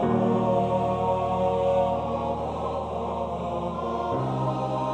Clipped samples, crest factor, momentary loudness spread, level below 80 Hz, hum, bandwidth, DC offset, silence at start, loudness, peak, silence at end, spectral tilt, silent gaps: under 0.1%; 14 dB; 7 LU; -46 dBFS; none; 9.2 kHz; under 0.1%; 0 s; -26 LUFS; -12 dBFS; 0 s; -8.5 dB/octave; none